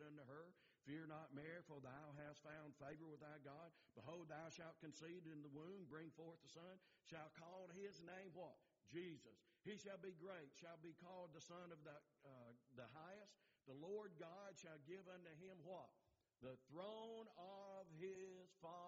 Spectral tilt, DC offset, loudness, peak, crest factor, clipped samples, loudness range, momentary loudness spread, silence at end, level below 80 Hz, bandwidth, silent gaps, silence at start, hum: -5 dB/octave; under 0.1%; -60 LUFS; -42 dBFS; 16 dB; under 0.1%; 2 LU; 7 LU; 0 s; under -90 dBFS; 7.2 kHz; none; 0 s; none